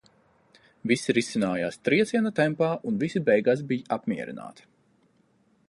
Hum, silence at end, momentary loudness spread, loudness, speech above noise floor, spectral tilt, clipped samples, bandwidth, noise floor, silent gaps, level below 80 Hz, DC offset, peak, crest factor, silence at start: none; 1.15 s; 11 LU; -26 LUFS; 40 dB; -5.5 dB/octave; under 0.1%; 11.5 kHz; -65 dBFS; none; -68 dBFS; under 0.1%; -8 dBFS; 18 dB; 0.85 s